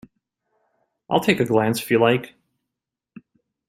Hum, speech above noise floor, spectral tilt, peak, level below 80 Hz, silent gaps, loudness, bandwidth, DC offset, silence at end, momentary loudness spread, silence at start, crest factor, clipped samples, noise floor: none; 66 dB; -5.5 dB/octave; -2 dBFS; -62 dBFS; none; -20 LUFS; 16 kHz; under 0.1%; 1.45 s; 6 LU; 1.1 s; 20 dB; under 0.1%; -85 dBFS